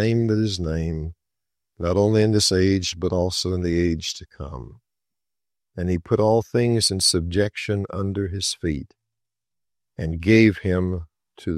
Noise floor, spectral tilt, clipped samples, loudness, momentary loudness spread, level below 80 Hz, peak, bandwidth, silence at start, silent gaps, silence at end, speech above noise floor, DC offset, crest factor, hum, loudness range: -90 dBFS; -5 dB/octave; under 0.1%; -22 LUFS; 14 LU; -46 dBFS; -2 dBFS; 14 kHz; 0 s; none; 0 s; 68 dB; under 0.1%; 20 dB; none; 4 LU